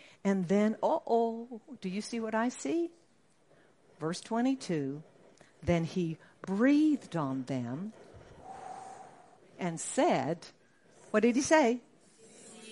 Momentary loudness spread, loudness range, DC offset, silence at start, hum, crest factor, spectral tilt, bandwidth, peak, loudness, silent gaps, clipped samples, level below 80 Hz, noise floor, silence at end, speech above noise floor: 20 LU; 5 LU; under 0.1%; 0.25 s; none; 20 dB; -5.5 dB/octave; 11.5 kHz; -12 dBFS; -31 LUFS; none; under 0.1%; -66 dBFS; -68 dBFS; 0 s; 38 dB